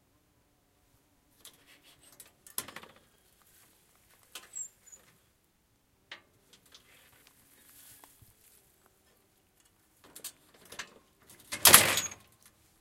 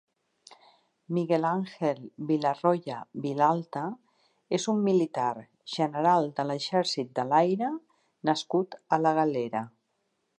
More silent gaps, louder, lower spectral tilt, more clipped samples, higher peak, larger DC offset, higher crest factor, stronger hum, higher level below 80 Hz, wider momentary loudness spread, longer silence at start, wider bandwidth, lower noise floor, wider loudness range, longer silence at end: neither; first, -24 LUFS vs -28 LUFS; second, 0 dB/octave vs -6 dB/octave; neither; first, 0 dBFS vs -10 dBFS; neither; first, 36 dB vs 20 dB; neither; first, -68 dBFS vs -80 dBFS; first, 33 LU vs 11 LU; first, 2.6 s vs 0.5 s; first, 16.5 kHz vs 10.5 kHz; second, -71 dBFS vs -77 dBFS; first, 26 LU vs 2 LU; about the same, 0.7 s vs 0.7 s